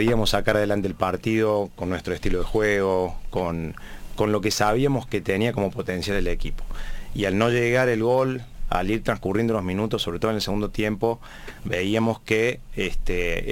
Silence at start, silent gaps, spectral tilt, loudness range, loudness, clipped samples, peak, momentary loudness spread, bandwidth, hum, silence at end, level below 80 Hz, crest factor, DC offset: 0 s; none; -5.5 dB/octave; 2 LU; -24 LUFS; under 0.1%; -4 dBFS; 11 LU; 17 kHz; none; 0 s; -34 dBFS; 18 dB; under 0.1%